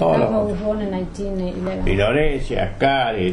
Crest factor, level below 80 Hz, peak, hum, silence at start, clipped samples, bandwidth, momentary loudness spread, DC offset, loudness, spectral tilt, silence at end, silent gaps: 16 dB; -28 dBFS; -4 dBFS; none; 0 s; under 0.1%; 10.5 kHz; 8 LU; under 0.1%; -21 LUFS; -7 dB/octave; 0 s; none